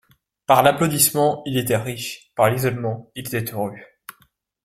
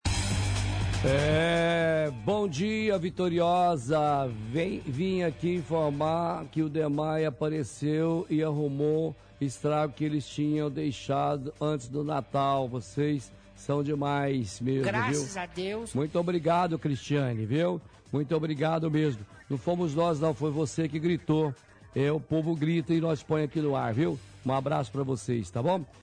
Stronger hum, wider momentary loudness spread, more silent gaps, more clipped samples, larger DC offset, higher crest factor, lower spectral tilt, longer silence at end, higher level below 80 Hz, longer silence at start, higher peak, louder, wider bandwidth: neither; first, 14 LU vs 6 LU; neither; neither; neither; first, 20 dB vs 12 dB; second, -4 dB/octave vs -6.5 dB/octave; first, 0.55 s vs 0.05 s; second, -56 dBFS vs -48 dBFS; first, 0.5 s vs 0.05 s; first, 0 dBFS vs -16 dBFS; first, -20 LUFS vs -29 LUFS; first, 16.5 kHz vs 10.5 kHz